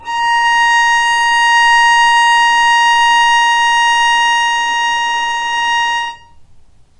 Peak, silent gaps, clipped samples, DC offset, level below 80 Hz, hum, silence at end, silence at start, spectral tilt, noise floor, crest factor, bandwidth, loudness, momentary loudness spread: -2 dBFS; none; under 0.1%; under 0.1%; -44 dBFS; none; 0.55 s; 0 s; 2.5 dB/octave; -41 dBFS; 10 dB; 11 kHz; -10 LUFS; 7 LU